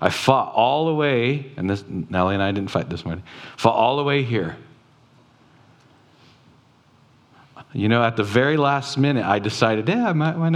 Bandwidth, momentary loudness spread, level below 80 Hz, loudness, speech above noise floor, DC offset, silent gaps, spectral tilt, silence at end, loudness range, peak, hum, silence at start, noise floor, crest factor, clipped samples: 14.5 kHz; 10 LU; -58 dBFS; -21 LUFS; 35 dB; under 0.1%; none; -6.5 dB/octave; 0 s; 8 LU; 0 dBFS; none; 0 s; -55 dBFS; 22 dB; under 0.1%